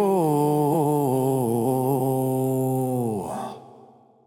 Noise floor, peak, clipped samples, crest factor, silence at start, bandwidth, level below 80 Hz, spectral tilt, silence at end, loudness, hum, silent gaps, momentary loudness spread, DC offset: -52 dBFS; -10 dBFS; under 0.1%; 12 dB; 0 s; 17.5 kHz; -64 dBFS; -8 dB/octave; 0.6 s; -23 LUFS; none; none; 10 LU; under 0.1%